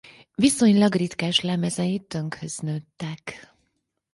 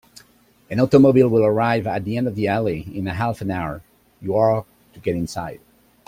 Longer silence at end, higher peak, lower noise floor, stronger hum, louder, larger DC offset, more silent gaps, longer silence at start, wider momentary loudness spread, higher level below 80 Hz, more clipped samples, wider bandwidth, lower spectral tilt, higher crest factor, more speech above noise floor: first, 0.75 s vs 0.5 s; second, -6 dBFS vs -2 dBFS; first, -75 dBFS vs -55 dBFS; neither; second, -23 LUFS vs -20 LUFS; neither; neither; second, 0.4 s vs 0.7 s; about the same, 17 LU vs 15 LU; second, -60 dBFS vs -50 dBFS; neither; second, 11.5 kHz vs 15.5 kHz; second, -4.5 dB/octave vs -8 dB/octave; about the same, 18 dB vs 18 dB; first, 52 dB vs 36 dB